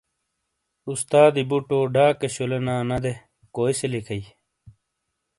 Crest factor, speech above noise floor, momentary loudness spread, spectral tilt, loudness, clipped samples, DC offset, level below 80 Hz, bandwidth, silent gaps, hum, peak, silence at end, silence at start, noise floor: 22 dB; 57 dB; 16 LU; -5.5 dB/octave; -22 LUFS; under 0.1%; under 0.1%; -54 dBFS; 11.5 kHz; none; none; -2 dBFS; 0.7 s; 0.85 s; -78 dBFS